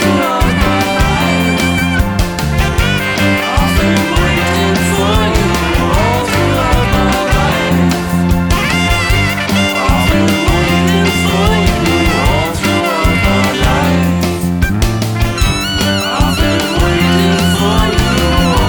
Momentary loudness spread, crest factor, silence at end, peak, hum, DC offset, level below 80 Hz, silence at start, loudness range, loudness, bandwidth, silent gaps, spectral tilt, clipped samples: 3 LU; 10 dB; 0 s; 0 dBFS; none; under 0.1%; -20 dBFS; 0 s; 1 LU; -12 LUFS; over 20 kHz; none; -5 dB/octave; under 0.1%